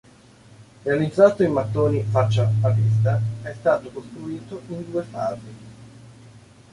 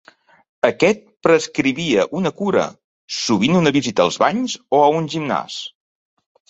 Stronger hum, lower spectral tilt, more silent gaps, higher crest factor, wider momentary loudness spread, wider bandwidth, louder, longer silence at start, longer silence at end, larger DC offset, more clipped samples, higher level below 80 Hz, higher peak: neither; first, -8 dB/octave vs -5 dB/octave; second, none vs 2.84-3.08 s; about the same, 20 dB vs 18 dB; first, 18 LU vs 8 LU; first, 10.5 kHz vs 8.2 kHz; second, -21 LUFS vs -18 LUFS; about the same, 0.6 s vs 0.65 s; second, 0.35 s vs 0.8 s; neither; neither; about the same, -54 dBFS vs -58 dBFS; about the same, -2 dBFS vs -2 dBFS